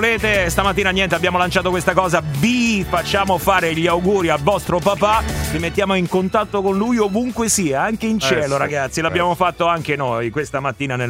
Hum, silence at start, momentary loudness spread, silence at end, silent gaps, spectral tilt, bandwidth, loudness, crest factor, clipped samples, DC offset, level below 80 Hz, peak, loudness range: none; 0 s; 4 LU; 0 s; none; -4.5 dB/octave; 16 kHz; -17 LUFS; 18 dB; under 0.1%; under 0.1%; -36 dBFS; 0 dBFS; 1 LU